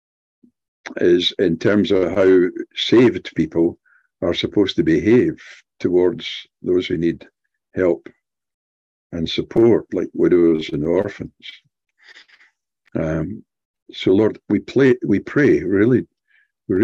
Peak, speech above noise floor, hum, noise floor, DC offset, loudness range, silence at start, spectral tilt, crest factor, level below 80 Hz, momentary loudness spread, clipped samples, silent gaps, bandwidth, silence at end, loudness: -2 dBFS; 44 dB; none; -62 dBFS; under 0.1%; 7 LU; 0.85 s; -7 dB/octave; 16 dB; -46 dBFS; 16 LU; under 0.1%; 8.54-9.10 s, 13.65-13.74 s, 13.82-13.86 s; 7.4 kHz; 0 s; -18 LUFS